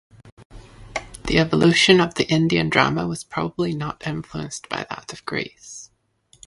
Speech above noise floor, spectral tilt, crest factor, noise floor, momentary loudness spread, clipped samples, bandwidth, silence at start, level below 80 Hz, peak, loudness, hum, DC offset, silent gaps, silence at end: 39 dB; -5 dB/octave; 22 dB; -59 dBFS; 17 LU; under 0.1%; 11.5 kHz; 0.25 s; -46 dBFS; 0 dBFS; -20 LUFS; none; under 0.1%; 0.32-0.37 s, 0.45-0.50 s; 0.6 s